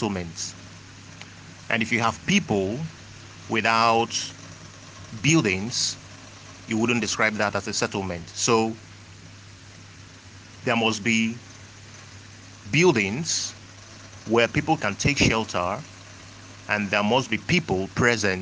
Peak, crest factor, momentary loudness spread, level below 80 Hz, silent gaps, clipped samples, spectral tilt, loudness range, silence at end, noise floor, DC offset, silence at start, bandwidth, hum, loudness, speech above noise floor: -4 dBFS; 22 dB; 23 LU; -52 dBFS; none; under 0.1%; -4 dB/octave; 4 LU; 0 s; -45 dBFS; under 0.1%; 0 s; 10.5 kHz; none; -23 LUFS; 22 dB